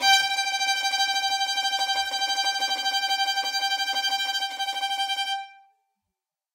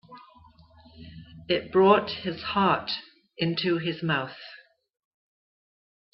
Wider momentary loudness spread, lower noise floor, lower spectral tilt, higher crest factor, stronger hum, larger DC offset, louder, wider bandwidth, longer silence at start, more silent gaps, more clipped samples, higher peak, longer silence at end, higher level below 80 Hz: second, 4 LU vs 25 LU; first, -86 dBFS vs -55 dBFS; second, 3.5 dB/octave vs -8.5 dB/octave; about the same, 18 dB vs 22 dB; neither; neither; about the same, -24 LUFS vs -25 LUFS; first, 16 kHz vs 5.8 kHz; about the same, 0 s vs 0.1 s; neither; neither; about the same, -8 dBFS vs -6 dBFS; second, 1 s vs 1.55 s; second, -74 dBFS vs -62 dBFS